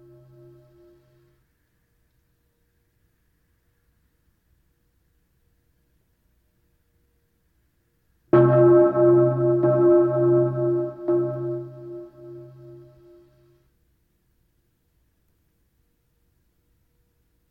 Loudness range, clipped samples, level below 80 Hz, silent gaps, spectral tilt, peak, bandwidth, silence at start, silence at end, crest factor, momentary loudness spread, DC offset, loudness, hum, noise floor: 13 LU; under 0.1%; -64 dBFS; none; -12 dB/octave; -4 dBFS; 3.2 kHz; 8.35 s; 4.8 s; 20 dB; 27 LU; under 0.1%; -19 LUFS; none; -68 dBFS